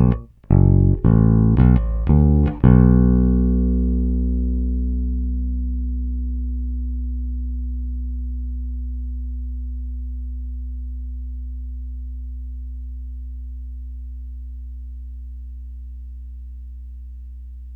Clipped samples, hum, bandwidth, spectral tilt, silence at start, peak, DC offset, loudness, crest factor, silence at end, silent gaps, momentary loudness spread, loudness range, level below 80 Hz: under 0.1%; 60 Hz at -50 dBFS; 2.7 kHz; -13 dB/octave; 0 s; 0 dBFS; under 0.1%; -20 LUFS; 20 dB; 0 s; none; 21 LU; 19 LU; -24 dBFS